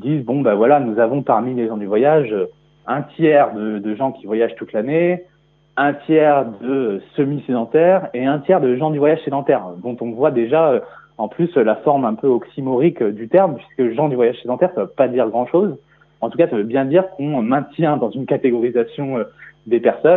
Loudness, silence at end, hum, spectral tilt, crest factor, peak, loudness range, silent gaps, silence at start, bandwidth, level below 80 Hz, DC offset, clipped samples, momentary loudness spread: -18 LUFS; 0 s; none; -11 dB/octave; 16 dB; 0 dBFS; 2 LU; none; 0 s; 4 kHz; -66 dBFS; under 0.1%; under 0.1%; 9 LU